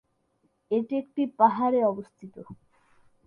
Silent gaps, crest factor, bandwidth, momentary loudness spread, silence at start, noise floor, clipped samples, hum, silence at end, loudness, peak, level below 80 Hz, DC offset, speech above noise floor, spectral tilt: none; 22 dB; 5.4 kHz; 23 LU; 0.7 s; -71 dBFS; under 0.1%; none; 0.75 s; -25 LUFS; -6 dBFS; -72 dBFS; under 0.1%; 45 dB; -9 dB/octave